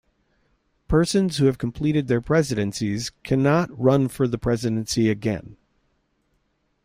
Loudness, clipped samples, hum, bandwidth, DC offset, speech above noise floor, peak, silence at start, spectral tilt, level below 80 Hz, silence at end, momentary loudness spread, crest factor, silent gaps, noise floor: -22 LUFS; under 0.1%; none; 16 kHz; under 0.1%; 48 dB; -6 dBFS; 0.9 s; -6 dB/octave; -44 dBFS; 1.3 s; 7 LU; 16 dB; none; -69 dBFS